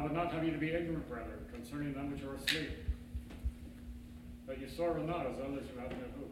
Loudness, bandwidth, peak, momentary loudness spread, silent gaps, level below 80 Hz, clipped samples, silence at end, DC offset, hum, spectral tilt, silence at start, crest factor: -40 LUFS; 16 kHz; -16 dBFS; 15 LU; none; -50 dBFS; under 0.1%; 0 s; under 0.1%; none; -5.5 dB/octave; 0 s; 24 dB